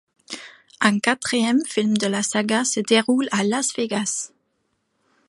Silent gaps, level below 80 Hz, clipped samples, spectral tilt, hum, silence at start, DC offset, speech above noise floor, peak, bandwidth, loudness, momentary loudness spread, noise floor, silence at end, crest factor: none; -70 dBFS; under 0.1%; -3 dB/octave; none; 0.3 s; under 0.1%; 51 dB; 0 dBFS; 11.5 kHz; -21 LUFS; 16 LU; -71 dBFS; 1 s; 22 dB